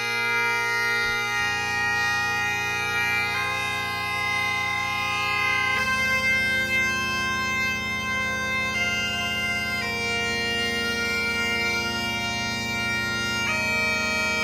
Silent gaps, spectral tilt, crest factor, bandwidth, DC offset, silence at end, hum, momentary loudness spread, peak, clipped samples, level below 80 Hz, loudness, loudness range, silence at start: none; -2.5 dB/octave; 12 dB; 17.5 kHz; under 0.1%; 0 s; none; 4 LU; -12 dBFS; under 0.1%; -48 dBFS; -23 LUFS; 2 LU; 0 s